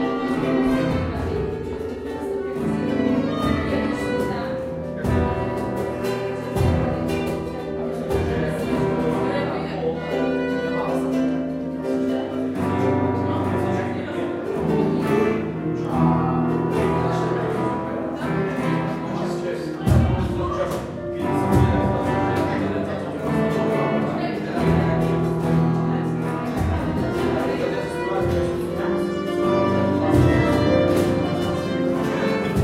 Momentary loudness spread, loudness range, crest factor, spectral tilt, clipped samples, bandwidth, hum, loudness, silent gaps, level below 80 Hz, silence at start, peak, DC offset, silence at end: 7 LU; 4 LU; 16 dB; -7.5 dB/octave; under 0.1%; 15.5 kHz; none; -22 LUFS; none; -38 dBFS; 0 s; -4 dBFS; under 0.1%; 0 s